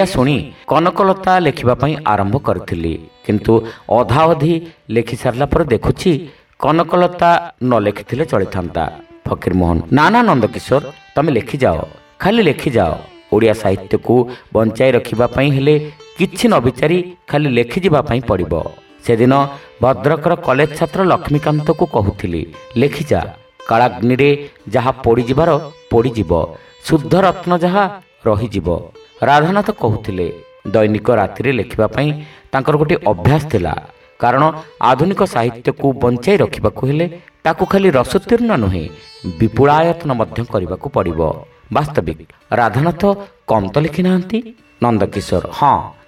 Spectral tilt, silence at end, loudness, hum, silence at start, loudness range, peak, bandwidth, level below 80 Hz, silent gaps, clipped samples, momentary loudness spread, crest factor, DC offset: -7 dB/octave; 0.15 s; -15 LUFS; none; 0 s; 2 LU; 0 dBFS; 15.5 kHz; -38 dBFS; none; under 0.1%; 9 LU; 14 dB; under 0.1%